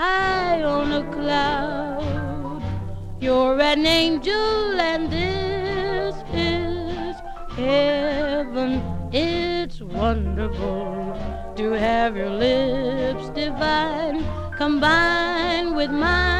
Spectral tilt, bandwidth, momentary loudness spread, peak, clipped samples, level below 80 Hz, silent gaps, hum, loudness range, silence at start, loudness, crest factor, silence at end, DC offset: -5.5 dB/octave; 14 kHz; 11 LU; -4 dBFS; under 0.1%; -34 dBFS; none; none; 4 LU; 0 s; -22 LUFS; 16 dB; 0 s; 0.3%